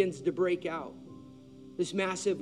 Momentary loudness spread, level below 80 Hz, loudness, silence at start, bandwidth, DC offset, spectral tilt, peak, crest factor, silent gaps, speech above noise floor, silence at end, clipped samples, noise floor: 20 LU; -72 dBFS; -32 LUFS; 0 s; 11 kHz; under 0.1%; -5 dB/octave; -14 dBFS; 18 dB; none; 20 dB; 0 s; under 0.1%; -51 dBFS